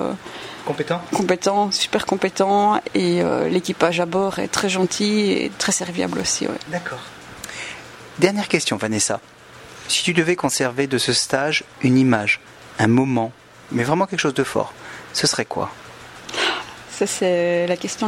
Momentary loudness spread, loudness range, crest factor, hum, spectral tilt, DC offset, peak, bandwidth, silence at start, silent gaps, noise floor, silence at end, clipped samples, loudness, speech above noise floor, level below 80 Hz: 14 LU; 4 LU; 20 dB; none; -4 dB/octave; under 0.1%; 0 dBFS; 16 kHz; 0 s; none; -41 dBFS; 0 s; under 0.1%; -20 LUFS; 22 dB; -56 dBFS